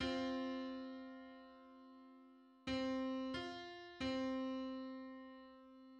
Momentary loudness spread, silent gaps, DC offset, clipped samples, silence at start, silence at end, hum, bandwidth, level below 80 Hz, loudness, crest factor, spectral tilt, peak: 20 LU; none; under 0.1%; under 0.1%; 0 s; 0 s; none; 9 kHz; -70 dBFS; -45 LUFS; 16 dB; -5 dB/octave; -30 dBFS